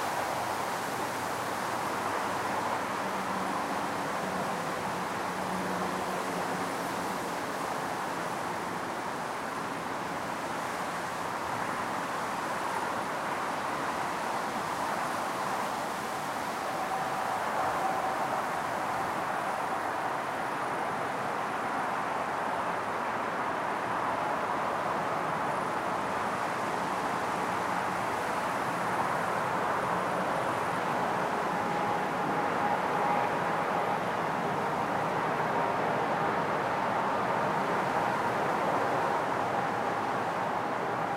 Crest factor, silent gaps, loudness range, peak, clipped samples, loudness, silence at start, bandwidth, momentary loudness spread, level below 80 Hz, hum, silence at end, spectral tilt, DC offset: 14 dB; none; 4 LU; -16 dBFS; under 0.1%; -31 LUFS; 0 s; 16 kHz; 4 LU; -64 dBFS; none; 0 s; -4 dB/octave; under 0.1%